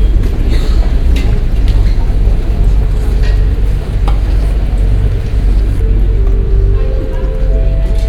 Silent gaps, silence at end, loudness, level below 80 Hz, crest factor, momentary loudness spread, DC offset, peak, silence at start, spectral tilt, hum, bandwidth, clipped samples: none; 0 s; -14 LUFS; -10 dBFS; 10 dB; 2 LU; under 0.1%; 0 dBFS; 0 s; -7.5 dB/octave; none; 5.2 kHz; under 0.1%